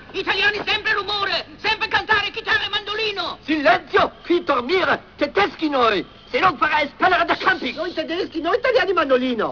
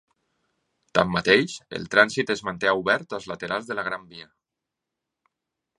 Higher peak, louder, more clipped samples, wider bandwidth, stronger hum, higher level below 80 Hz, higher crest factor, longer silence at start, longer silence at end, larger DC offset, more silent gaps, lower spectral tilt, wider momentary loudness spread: second, -4 dBFS vs 0 dBFS; first, -20 LUFS vs -23 LUFS; neither; second, 5.4 kHz vs 11.5 kHz; neither; first, -50 dBFS vs -60 dBFS; second, 16 dB vs 26 dB; second, 0 s vs 0.95 s; second, 0 s vs 1.55 s; first, 0.1% vs under 0.1%; neither; about the same, -4.5 dB/octave vs -4 dB/octave; second, 6 LU vs 14 LU